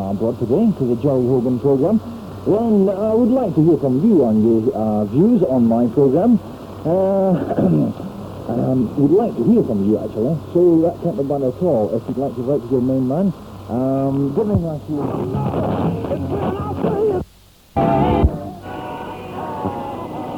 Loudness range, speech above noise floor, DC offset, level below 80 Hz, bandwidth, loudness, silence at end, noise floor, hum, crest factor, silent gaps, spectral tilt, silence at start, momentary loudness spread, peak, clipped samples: 5 LU; 31 dB; under 0.1%; -36 dBFS; 17.5 kHz; -18 LUFS; 0 s; -48 dBFS; none; 14 dB; none; -10 dB/octave; 0 s; 12 LU; -4 dBFS; under 0.1%